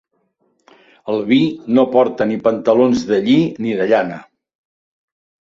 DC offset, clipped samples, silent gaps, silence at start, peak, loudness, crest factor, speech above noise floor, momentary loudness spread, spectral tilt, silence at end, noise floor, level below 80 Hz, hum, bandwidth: under 0.1%; under 0.1%; none; 1.05 s; -2 dBFS; -16 LUFS; 16 dB; 49 dB; 9 LU; -6.5 dB/octave; 1.25 s; -64 dBFS; -56 dBFS; none; 7.4 kHz